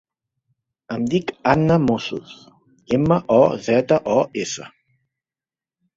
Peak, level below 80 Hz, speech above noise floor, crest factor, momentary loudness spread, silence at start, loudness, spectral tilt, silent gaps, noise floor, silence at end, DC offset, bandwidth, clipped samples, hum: -2 dBFS; -50 dBFS; over 71 dB; 20 dB; 13 LU; 0.9 s; -19 LUFS; -6.5 dB/octave; none; under -90 dBFS; 1.3 s; under 0.1%; 7.8 kHz; under 0.1%; none